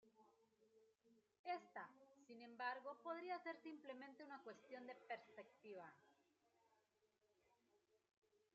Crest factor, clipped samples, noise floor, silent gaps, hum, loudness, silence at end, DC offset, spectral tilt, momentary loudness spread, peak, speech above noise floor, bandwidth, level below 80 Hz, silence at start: 22 dB; under 0.1%; -85 dBFS; 1.39-1.44 s; none; -55 LUFS; 0.75 s; under 0.1%; -1.5 dB/octave; 12 LU; -36 dBFS; 30 dB; 7.4 kHz; under -90 dBFS; 0.05 s